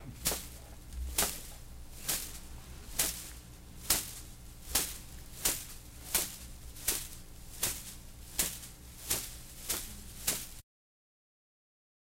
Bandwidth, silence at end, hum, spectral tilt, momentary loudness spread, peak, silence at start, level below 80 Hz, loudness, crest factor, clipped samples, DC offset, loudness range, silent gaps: 16.5 kHz; 1.4 s; none; -1 dB/octave; 18 LU; -8 dBFS; 0 s; -50 dBFS; -35 LUFS; 30 dB; under 0.1%; under 0.1%; 3 LU; none